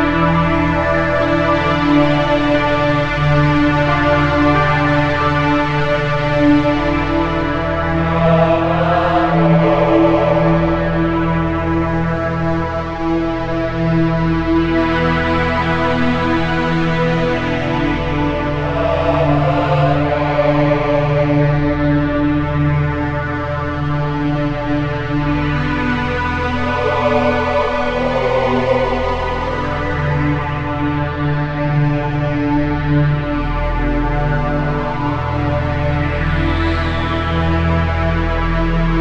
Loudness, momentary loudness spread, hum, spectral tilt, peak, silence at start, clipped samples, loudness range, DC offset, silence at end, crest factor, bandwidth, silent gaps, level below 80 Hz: -16 LUFS; 6 LU; none; -8 dB/octave; 0 dBFS; 0 s; under 0.1%; 4 LU; 0.9%; 0 s; 14 dB; 7.8 kHz; none; -26 dBFS